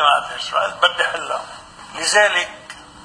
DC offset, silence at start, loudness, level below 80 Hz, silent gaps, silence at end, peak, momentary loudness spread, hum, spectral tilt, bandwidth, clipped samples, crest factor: under 0.1%; 0 s; -18 LUFS; -56 dBFS; none; 0 s; 0 dBFS; 22 LU; none; 0.5 dB/octave; 10.5 kHz; under 0.1%; 20 dB